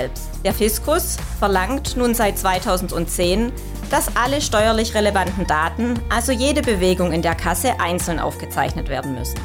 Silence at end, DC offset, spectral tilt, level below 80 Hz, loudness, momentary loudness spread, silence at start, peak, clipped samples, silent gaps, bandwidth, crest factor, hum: 0 s; under 0.1%; -4 dB/octave; -28 dBFS; -20 LUFS; 6 LU; 0 s; -6 dBFS; under 0.1%; none; 18.5 kHz; 14 dB; none